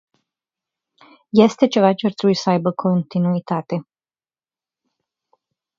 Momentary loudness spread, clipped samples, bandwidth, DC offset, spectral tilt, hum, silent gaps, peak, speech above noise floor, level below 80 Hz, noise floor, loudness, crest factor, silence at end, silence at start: 9 LU; under 0.1%; 7.6 kHz; under 0.1%; -7 dB/octave; none; none; 0 dBFS; over 72 dB; -66 dBFS; under -90 dBFS; -18 LUFS; 20 dB; 1.95 s; 1.35 s